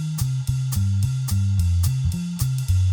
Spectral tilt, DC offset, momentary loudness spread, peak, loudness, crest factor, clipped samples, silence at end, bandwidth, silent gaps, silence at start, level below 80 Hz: -5.5 dB/octave; under 0.1%; 4 LU; -10 dBFS; -23 LUFS; 12 dB; under 0.1%; 0 s; over 20 kHz; none; 0 s; -36 dBFS